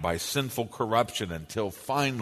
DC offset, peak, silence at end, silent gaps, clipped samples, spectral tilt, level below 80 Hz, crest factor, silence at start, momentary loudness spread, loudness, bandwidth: under 0.1%; -8 dBFS; 0 s; none; under 0.1%; -4 dB/octave; -54 dBFS; 20 dB; 0 s; 7 LU; -29 LUFS; 13.5 kHz